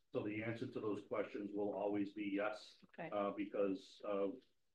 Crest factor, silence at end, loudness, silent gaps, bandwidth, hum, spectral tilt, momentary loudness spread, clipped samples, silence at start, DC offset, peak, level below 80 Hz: 16 dB; 0.35 s; -43 LUFS; none; 9 kHz; none; -7 dB/octave; 6 LU; under 0.1%; 0.15 s; under 0.1%; -28 dBFS; -86 dBFS